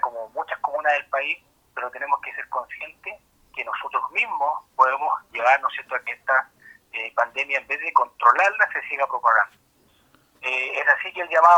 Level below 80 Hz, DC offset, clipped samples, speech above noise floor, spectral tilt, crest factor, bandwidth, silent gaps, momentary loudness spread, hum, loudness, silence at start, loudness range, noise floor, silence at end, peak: -70 dBFS; under 0.1%; under 0.1%; 38 dB; -1.5 dB/octave; 22 dB; 16 kHz; none; 14 LU; none; -22 LUFS; 0.05 s; 6 LU; -61 dBFS; 0 s; -2 dBFS